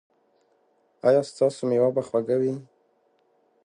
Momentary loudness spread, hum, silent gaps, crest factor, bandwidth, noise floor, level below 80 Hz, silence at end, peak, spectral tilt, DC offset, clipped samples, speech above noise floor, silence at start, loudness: 5 LU; none; none; 18 dB; 10.5 kHz; -66 dBFS; -74 dBFS; 1.05 s; -8 dBFS; -7 dB/octave; under 0.1%; under 0.1%; 43 dB; 1.05 s; -24 LUFS